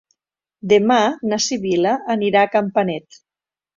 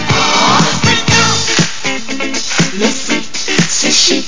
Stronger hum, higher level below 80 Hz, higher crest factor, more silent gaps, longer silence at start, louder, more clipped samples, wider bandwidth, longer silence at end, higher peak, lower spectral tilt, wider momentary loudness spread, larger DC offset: neither; second, -62 dBFS vs -36 dBFS; about the same, 16 dB vs 14 dB; neither; first, 0.65 s vs 0 s; second, -18 LUFS vs -11 LUFS; neither; about the same, 7.6 kHz vs 7.8 kHz; first, 0.75 s vs 0 s; about the same, -2 dBFS vs 0 dBFS; first, -4 dB/octave vs -2.5 dB/octave; about the same, 7 LU vs 8 LU; second, under 0.1% vs 10%